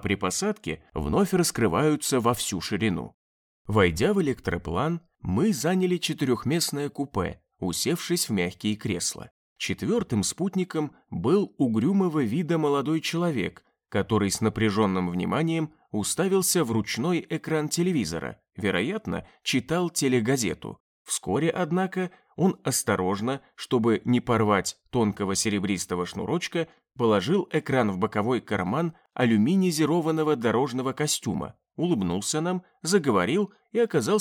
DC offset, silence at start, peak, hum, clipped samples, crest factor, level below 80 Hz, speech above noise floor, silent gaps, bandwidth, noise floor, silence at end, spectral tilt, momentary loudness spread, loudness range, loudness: under 0.1%; 0 s; -8 dBFS; none; under 0.1%; 18 dB; -52 dBFS; over 65 dB; 3.14-3.65 s, 9.31-9.56 s, 20.80-21.05 s; 19.5 kHz; under -90 dBFS; 0 s; -5 dB/octave; 8 LU; 3 LU; -26 LUFS